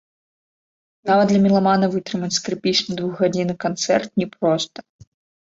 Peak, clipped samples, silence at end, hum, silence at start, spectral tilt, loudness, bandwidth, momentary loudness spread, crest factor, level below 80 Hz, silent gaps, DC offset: -4 dBFS; under 0.1%; 0.6 s; none; 1.05 s; -5 dB/octave; -20 LUFS; 7.8 kHz; 9 LU; 18 dB; -60 dBFS; none; under 0.1%